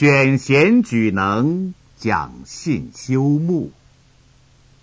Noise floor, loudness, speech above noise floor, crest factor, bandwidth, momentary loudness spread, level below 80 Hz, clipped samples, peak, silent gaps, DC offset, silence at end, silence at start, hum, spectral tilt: -52 dBFS; -18 LUFS; 35 dB; 16 dB; 8 kHz; 14 LU; -48 dBFS; under 0.1%; -2 dBFS; none; under 0.1%; 1.15 s; 0 s; none; -7 dB/octave